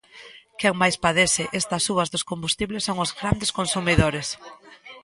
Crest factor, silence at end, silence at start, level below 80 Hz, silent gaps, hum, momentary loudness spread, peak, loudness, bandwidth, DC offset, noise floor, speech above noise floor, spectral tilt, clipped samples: 22 dB; 0.05 s; 0.15 s; -42 dBFS; none; none; 7 LU; -2 dBFS; -22 LUFS; 11.5 kHz; under 0.1%; -47 dBFS; 23 dB; -3.5 dB/octave; under 0.1%